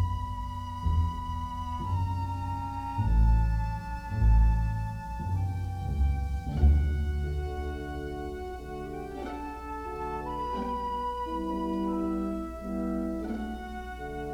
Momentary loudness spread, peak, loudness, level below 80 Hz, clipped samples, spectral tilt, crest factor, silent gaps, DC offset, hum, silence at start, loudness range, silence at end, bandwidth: 12 LU; -12 dBFS; -31 LUFS; -32 dBFS; under 0.1%; -8 dB/octave; 16 dB; none; under 0.1%; 60 Hz at -45 dBFS; 0 s; 7 LU; 0 s; 8.6 kHz